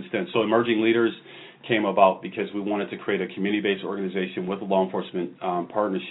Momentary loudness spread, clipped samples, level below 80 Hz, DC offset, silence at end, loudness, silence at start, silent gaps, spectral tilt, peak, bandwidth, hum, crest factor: 9 LU; under 0.1%; -72 dBFS; under 0.1%; 0 s; -25 LUFS; 0 s; none; -10 dB/octave; -4 dBFS; 4.1 kHz; none; 22 dB